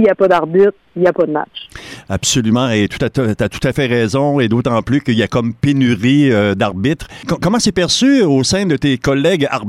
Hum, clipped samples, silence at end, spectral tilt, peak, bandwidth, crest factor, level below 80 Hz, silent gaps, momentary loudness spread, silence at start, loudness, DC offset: none; under 0.1%; 0 s; -5 dB/octave; -2 dBFS; 14.5 kHz; 10 dB; -40 dBFS; none; 7 LU; 0 s; -14 LUFS; under 0.1%